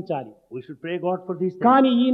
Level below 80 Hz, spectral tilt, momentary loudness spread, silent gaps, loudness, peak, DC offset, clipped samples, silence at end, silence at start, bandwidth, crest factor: -76 dBFS; -9 dB/octave; 21 LU; none; -21 LUFS; -6 dBFS; under 0.1%; under 0.1%; 0 s; 0 s; 4.9 kHz; 16 dB